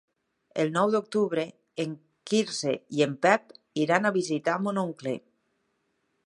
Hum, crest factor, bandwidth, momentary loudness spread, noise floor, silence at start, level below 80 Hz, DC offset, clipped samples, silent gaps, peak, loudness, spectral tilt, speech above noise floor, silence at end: none; 24 dB; 11.5 kHz; 11 LU; -75 dBFS; 0.55 s; -78 dBFS; under 0.1%; under 0.1%; none; -6 dBFS; -27 LUFS; -5 dB/octave; 49 dB; 1.05 s